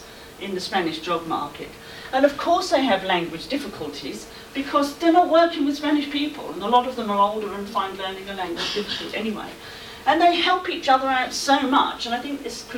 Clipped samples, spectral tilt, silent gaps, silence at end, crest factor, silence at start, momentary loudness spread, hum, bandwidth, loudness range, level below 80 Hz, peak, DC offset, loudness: under 0.1%; -3.5 dB/octave; none; 0 s; 16 dB; 0 s; 15 LU; none; 18.5 kHz; 3 LU; -54 dBFS; -6 dBFS; under 0.1%; -22 LUFS